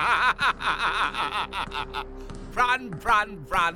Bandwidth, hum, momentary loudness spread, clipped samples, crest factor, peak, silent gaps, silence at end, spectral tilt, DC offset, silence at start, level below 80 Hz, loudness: 19 kHz; none; 12 LU; under 0.1%; 18 dB; -8 dBFS; none; 0 s; -3 dB/octave; under 0.1%; 0 s; -44 dBFS; -25 LUFS